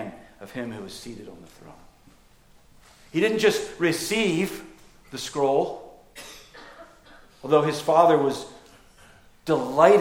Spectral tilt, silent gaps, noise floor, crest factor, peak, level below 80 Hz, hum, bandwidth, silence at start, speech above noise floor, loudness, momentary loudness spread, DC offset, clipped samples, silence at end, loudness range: -4.5 dB/octave; none; -55 dBFS; 22 dB; -4 dBFS; -58 dBFS; none; 17 kHz; 0 s; 32 dB; -23 LUFS; 24 LU; under 0.1%; under 0.1%; 0 s; 6 LU